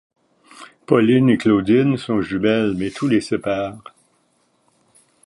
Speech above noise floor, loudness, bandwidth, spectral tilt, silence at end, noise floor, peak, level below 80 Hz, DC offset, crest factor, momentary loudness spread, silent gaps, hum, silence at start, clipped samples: 46 dB; -18 LUFS; 11.5 kHz; -7 dB/octave; 1.5 s; -63 dBFS; -2 dBFS; -54 dBFS; under 0.1%; 18 dB; 9 LU; none; none; 0.55 s; under 0.1%